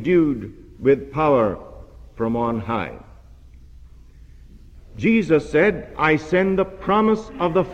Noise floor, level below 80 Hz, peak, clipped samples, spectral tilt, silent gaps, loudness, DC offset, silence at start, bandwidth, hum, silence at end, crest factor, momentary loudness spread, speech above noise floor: -44 dBFS; -44 dBFS; -4 dBFS; under 0.1%; -7.5 dB/octave; none; -20 LUFS; under 0.1%; 0 s; 8.8 kHz; none; 0 s; 18 dB; 9 LU; 25 dB